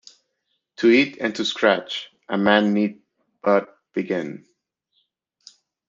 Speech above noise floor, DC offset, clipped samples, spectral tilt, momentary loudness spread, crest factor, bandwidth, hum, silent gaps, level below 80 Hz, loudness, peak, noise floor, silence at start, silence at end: 55 dB; under 0.1%; under 0.1%; -5.5 dB/octave; 14 LU; 20 dB; 7.6 kHz; none; none; -70 dBFS; -21 LUFS; -4 dBFS; -75 dBFS; 0.8 s; 1.5 s